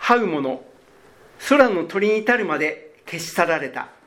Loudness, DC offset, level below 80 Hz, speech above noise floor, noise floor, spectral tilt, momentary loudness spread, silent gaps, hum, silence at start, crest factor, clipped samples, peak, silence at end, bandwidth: -20 LUFS; under 0.1%; -62 dBFS; 31 dB; -51 dBFS; -4.5 dB/octave; 17 LU; none; none; 0 s; 20 dB; under 0.1%; 0 dBFS; 0.2 s; 17 kHz